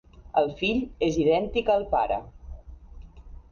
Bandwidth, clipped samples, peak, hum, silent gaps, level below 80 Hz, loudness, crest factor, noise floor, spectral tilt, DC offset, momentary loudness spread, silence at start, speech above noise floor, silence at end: 7 kHz; under 0.1%; -10 dBFS; none; none; -44 dBFS; -25 LUFS; 16 dB; -45 dBFS; -6 dB/octave; under 0.1%; 22 LU; 0.15 s; 20 dB; 0.1 s